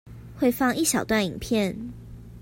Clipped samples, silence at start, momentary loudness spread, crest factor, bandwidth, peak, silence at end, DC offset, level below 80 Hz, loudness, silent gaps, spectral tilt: under 0.1%; 0.05 s; 21 LU; 16 dB; 16.5 kHz; -10 dBFS; 0 s; under 0.1%; -48 dBFS; -24 LUFS; none; -4 dB/octave